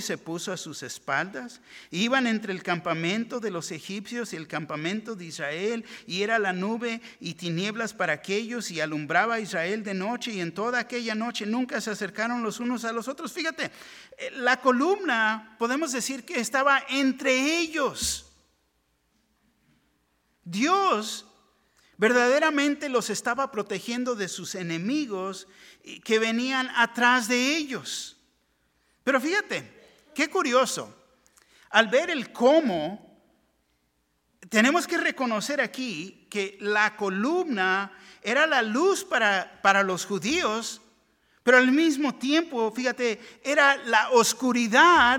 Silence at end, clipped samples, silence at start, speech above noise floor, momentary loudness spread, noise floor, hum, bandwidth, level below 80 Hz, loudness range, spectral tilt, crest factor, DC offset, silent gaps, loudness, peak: 0 s; under 0.1%; 0 s; 46 dB; 13 LU; -72 dBFS; none; 17.5 kHz; -64 dBFS; 6 LU; -3 dB/octave; 24 dB; under 0.1%; none; -25 LUFS; -2 dBFS